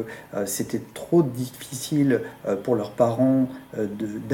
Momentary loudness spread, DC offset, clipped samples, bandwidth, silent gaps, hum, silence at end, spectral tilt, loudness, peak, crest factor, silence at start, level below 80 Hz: 11 LU; under 0.1%; under 0.1%; 17.5 kHz; none; none; 0 s; -6 dB/octave; -25 LUFS; -6 dBFS; 18 dB; 0 s; -62 dBFS